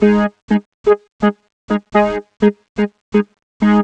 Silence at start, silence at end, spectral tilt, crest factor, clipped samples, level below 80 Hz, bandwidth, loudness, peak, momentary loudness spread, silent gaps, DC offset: 0 s; 0 s; -8 dB/octave; 14 dB; under 0.1%; -44 dBFS; 7.6 kHz; -17 LUFS; -2 dBFS; 7 LU; 0.42-0.48 s, 0.66-0.84 s, 1.12-1.19 s, 1.53-1.68 s, 2.69-2.75 s, 3.01-3.12 s, 3.43-3.60 s; under 0.1%